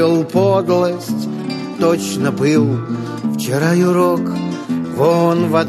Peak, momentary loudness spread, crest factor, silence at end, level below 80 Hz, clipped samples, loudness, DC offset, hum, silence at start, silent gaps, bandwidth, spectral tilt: -2 dBFS; 8 LU; 14 dB; 0 s; -58 dBFS; under 0.1%; -16 LUFS; under 0.1%; none; 0 s; none; 13.5 kHz; -6.5 dB/octave